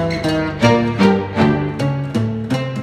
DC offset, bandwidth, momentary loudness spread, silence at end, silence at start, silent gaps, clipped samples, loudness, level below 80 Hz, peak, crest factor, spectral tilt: under 0.1%; 13.5 kHz; 6 LU; 0 s; 0 s; none; under 0.1%; -17 LUFS; -40 dBFS; 0 dBFS; 16 dB; -7 dB/octave